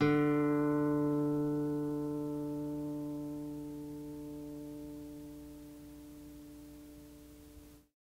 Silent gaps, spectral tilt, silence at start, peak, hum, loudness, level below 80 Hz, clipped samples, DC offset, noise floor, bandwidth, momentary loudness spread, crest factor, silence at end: none; -8 dB/octave; 0 s; -18 dBFS; none; -36 LUFS; -62 dBFS; under 0.1%; under 0.1%; -56 dBFS; 16 kHz; 22 LU; 18 dB; 0.25 s